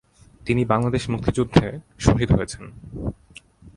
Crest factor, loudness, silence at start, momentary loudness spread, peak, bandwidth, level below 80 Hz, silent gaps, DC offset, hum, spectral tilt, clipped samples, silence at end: 22 dB; -22 LUFS; 0.45 s; 14 LU; 0 dBFS; 11.5 kHz; -36 dBFS; none; under 0.1%; none; -6.5 dB/octave; under 0.1%; 0.05 s